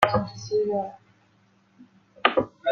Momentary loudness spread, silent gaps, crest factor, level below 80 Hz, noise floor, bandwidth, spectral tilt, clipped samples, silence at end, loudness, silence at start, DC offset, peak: 7 LU; none; 26 dB; -58 dBFS; -62 dBFS; 14.5 kHz; -5 dB/octave; under 0.1%; 0 s; -26 LUFS; 0 s; under 0.1%; 0 dBFS